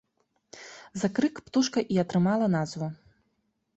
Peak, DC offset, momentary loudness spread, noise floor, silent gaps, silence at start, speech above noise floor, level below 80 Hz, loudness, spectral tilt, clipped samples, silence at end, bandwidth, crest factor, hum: -12 dBFS; under 0.1%; 18 LU; -75 dBFS; none; 0.55 s; 49 dB; -66 dBFS; -27 LUFS; -6 dB/octave; under 0.1%; 0.8 s; 8.2 kHz; 18 dB; none